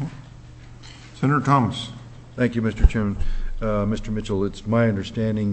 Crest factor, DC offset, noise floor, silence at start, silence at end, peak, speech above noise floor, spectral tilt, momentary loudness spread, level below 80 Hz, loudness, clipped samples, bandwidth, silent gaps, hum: 22 dB; under 0.1%; -42 dBFS; 0 s; 0 s; 0 dBFS; 21 dB; -7.5 dB/octave; 22 LU; -28 dBFS; -23 LUFS; under 0.1%; 8.6 kHz; none; none